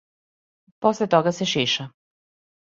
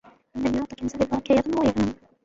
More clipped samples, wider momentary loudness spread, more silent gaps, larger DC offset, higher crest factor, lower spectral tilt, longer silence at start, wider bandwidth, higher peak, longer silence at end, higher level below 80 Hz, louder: neither; about the same, 6 LU vs 8 LU; neither; neither; first, 22 dB vs 16 dB; second, -4.5 dB/octave vs -6.5 dB/octave; first, 0.8 s vs 0.35 s; about the same, 7.8 kHz vs 7.8 kHz; first, -4 dBFS vs -8 dBFS; first, 0.8 s vs 0.3 s; second, -66 dBFS vs -48 dBFS; first, -22 LUFS vs -25 LUFS